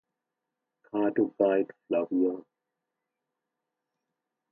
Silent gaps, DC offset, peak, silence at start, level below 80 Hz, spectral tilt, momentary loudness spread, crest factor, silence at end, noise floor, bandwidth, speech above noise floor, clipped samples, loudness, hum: none; under 0.1%; -12 dBFS; 0.95 s; -82 dBFS; -10 dB/octave; 7 LU; 20 dB; 2.1 s; -86 dBFS; 3.4 kHz; 59 dB; under 0.1%; -28 LUFS; none